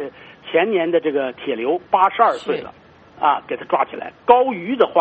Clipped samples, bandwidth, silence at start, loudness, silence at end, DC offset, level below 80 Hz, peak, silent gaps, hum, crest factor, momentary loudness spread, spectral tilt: under 0.1%; 7.6 kHz; 0 s; -19 LUFS; 0 s; under 0.1%; -62 dBFS; 0 dBFS; none; none; 18 dB; 11 LU; -2.5 dB/octave